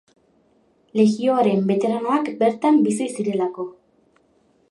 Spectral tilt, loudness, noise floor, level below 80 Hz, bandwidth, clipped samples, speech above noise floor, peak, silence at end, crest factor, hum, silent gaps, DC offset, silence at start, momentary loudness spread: -6.5 dB/octave; -20 LUFS; -61 dBFS; -72 dBFS; 11.5 kHz; under 0.1%; 41 dB; -4 dBFS; 1 s; 16 dB; none; none; under 0.1%; 0.95 s; 9 LU